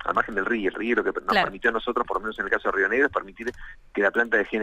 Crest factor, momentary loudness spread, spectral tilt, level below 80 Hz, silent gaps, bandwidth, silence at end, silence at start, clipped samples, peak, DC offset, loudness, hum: 18 dB; 8 LU; -5 dB/octave; -50 dBFS; none; 13.5 kHz; 0 s; 0 s; under 0.1%; -8 dBFS; under 0.1%; -24 LUFS; none